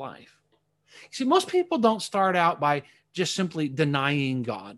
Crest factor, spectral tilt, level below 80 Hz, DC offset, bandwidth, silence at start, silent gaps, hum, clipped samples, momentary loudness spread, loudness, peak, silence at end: 18 dB; -5 dB/octave; -70 dBFS; under 0.1%; 12.5 kHz; 0 s; none; none; under 0.1%; 8 LU; -25 LUFS; -8 dBFS; 0 s